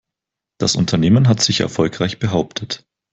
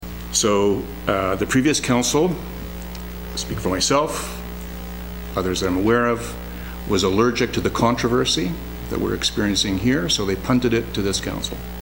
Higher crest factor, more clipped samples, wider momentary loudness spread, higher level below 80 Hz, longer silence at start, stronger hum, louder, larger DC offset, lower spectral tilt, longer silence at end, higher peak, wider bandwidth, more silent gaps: about the same, 16 dB vs 20 dB; neither; about the same, 12 LU vs 14 LU; second, -48 dBFS vs -36 dBFS; first, 0.6 s vs 0 s; neither; first, -17 LUFS vs -21 LUFS; second, under 0.1% vs 0.6%; about the same, -5 dB/octave vs -4 dB/octave; first, 0.35 s vs 0 s; about the same, -2 dBFS vs -2 dBFS; second, 8.2 kHz vs 16.5 kHz; neither